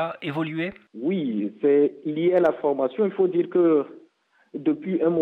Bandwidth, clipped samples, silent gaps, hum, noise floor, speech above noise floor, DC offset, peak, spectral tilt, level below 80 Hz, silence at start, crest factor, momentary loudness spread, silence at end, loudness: 4.2 kHz; under 0.1%; none; none; -62 dBFS; 39 dB; under 0.1%; -8 dBFS; -9 dB/octave; -70 dBFS; 0 s; 14 dB; 9 LU; 0 s; -23 LUFS